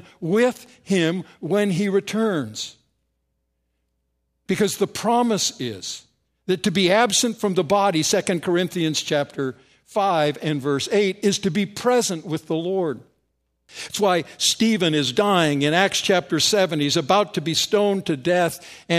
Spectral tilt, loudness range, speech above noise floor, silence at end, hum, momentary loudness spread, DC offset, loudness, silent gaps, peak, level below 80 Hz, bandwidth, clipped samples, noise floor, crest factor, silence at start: -4 dB/octave; 6 LU; 52 dB; 0 s; none; 11 LU; under 0.1%; -21 LUFS; none; -2 dBFS; -64 dBFS; 15.5 kHz; under 0.1%; -73 dBFS; 20 dB; 0.2 s